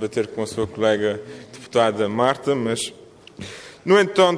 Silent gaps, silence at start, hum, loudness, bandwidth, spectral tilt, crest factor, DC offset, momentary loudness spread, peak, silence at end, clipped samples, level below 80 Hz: none; 0 s; none; -21 LUFS; 11 kHz; -4.5 dB/octave; 18 dB; under 0.1%; 19 LU; -4 dBFS; 0 s; under 0.1%; -58 dBFS